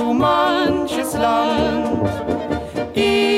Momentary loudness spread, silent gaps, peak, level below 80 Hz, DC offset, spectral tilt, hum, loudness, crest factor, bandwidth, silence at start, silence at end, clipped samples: 7 LU; none; -6 dBFS; -40 dBFS; under 0.1%; -5 dB/octave; none; -19 LUFS; 12 dB; 16 kHz; 0 s; 0 s; under 0.1%